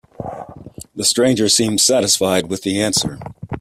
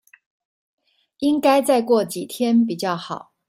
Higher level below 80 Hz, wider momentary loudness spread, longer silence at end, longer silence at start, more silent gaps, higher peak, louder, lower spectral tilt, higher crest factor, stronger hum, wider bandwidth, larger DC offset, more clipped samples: first, -50 dBFS vs -70 dBFS; first, 20 LU vs 10 LU; second, 0 s vs 0.3 s; second, 0.2 s vs 1.2 s; neither; about the same, -2 dBFS vs -4 dBFS; first, -15 LUFS vs -20 LUFS; second, -3 dB/octave vs -5 dB/octave; about the same, 16 dB vs 16 dB; neither; about the same, 16 kHz vs 16 kHz; neither; neither